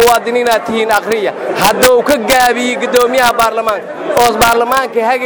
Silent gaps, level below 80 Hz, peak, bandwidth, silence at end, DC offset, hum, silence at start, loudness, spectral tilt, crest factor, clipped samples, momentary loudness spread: none; -40 dBFS; 0 dBFS; over 20 kHz; 0 s; under 0.1%; none; 0 s; -11 LUFS; -2.5 dB/octave; 10 dB; 0.2%; 7 LU